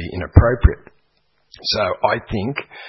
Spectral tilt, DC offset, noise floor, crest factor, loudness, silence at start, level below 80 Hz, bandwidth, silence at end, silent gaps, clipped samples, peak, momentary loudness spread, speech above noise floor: -7 dB/octave; under 0.1%; -64 dBFS; 18 dB; -18 LUFS; 0 s; -26 dBFS; 6 kHz; 0 s; none; under 0.1%; 0 dBFS; 11 LU; 47 dB